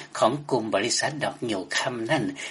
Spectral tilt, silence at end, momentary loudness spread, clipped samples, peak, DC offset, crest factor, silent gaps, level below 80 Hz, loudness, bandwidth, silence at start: -3.5 dB/octave; 0 s; 5 LU; under 0.1%; -8 dBFS; under 0.1%; 20 dB; none; -68 dBFS; -26 LUFS; 11.5 kHz; 0 s